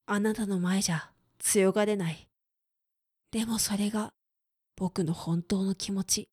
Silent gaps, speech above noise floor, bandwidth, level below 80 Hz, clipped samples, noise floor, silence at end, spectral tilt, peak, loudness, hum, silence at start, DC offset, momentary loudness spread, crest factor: none; 56 dB; 16 kHz; -60 dBFS; under 0.1%; -85 dBFS; 0.1 s; -4.5 dB/octave; -12 dBFS; -29 LUFS; none; 0.1 s; under 0.1%; 10 LU; 18 dB